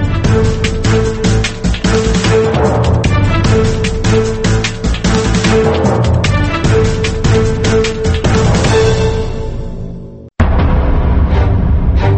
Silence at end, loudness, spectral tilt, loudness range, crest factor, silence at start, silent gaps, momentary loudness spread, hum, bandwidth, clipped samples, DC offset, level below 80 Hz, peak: 0 s; -12 LUFS; -6 dB/octave; 2 LU; 12 dB; 0 s; none; 5 LU; none; 8.8 kHz; under 0.1%; under 0.1%; -16 dBFS; 0 dBFS